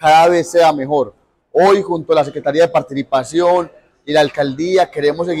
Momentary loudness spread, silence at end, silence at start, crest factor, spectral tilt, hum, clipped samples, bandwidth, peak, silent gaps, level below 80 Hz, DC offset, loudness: 7 LU; 0 s; 0 s; 10 dB; -5 dB/octave; none; under 0.1%; 15 kHz; -4 dBFS; none; -54 dBFS; under 0.1%; -15 LUFS